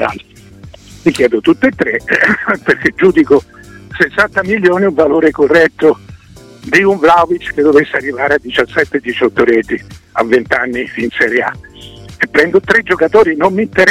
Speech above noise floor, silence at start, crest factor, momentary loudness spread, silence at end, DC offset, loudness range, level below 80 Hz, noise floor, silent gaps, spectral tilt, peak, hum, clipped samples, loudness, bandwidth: 26 dB; 0 s; 12 dB; 9 LU; 0 s; under 0.1%; 3 LU; -44 dBFS; -37 dBFS; none; -5.5 dB/octave; 0 dBFS; none; under 0.1%; -11 LUFS; 13.5 kHz